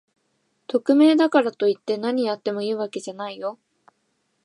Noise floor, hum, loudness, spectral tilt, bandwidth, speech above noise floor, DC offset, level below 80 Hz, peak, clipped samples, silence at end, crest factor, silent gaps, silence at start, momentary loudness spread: -71 dBFS; none; -22 LUFS; -5.5 dB/octave; 11 kHz; 50 dB; under 0.1%; -80 dBFS; -4 dBFS; under 0.1%; 0.9 s; 18 dB; none; 0.7 s; 15 LU